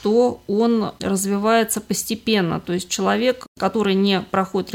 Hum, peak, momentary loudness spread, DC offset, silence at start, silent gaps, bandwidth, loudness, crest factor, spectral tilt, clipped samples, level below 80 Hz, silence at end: none; -4 dBFS; 5 LU; under 0.1%; 0 s; 3.48-3.55 s; 17 kHz; -20 LUFS; 14 dB; -4.5 dB/octave; under 0.1%; -54 dBFS; 0 s